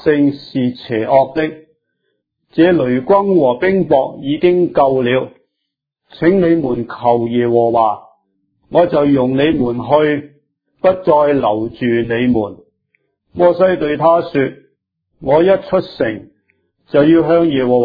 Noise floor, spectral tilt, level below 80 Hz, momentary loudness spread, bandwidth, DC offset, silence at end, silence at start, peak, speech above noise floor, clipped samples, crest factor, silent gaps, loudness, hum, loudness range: -76 dBFS; -10 dB/octave; -48 dBFS; 8 LU; 5 kHz; under 0.1%; 0 s; 0.05 s; 0 dBFS; 63 dB; under 0.1%; 14 dB; none; -14 LUFS; none; 2 LU